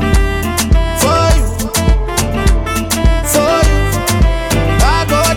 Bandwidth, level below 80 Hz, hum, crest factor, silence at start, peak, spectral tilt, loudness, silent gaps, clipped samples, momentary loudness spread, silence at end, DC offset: 17.5 kHz; -14 dBFS; none; 10 dB; 0 s; -2 dBFS; -4.5 dB/octave; -13 LUFS; none; under 0.1%; 4 LU; 0 s; under 0.1%